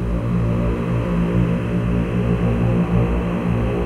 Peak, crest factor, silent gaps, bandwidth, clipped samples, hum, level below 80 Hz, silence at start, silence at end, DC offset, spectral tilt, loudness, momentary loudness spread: -6 dBFS; 14 dB; none; 9.6 kHz; under 0.1%; none; -26 dBFS; 0 s; 0 s; under 0.1%; -9 dB/octave; -20 LUFS; 2 LU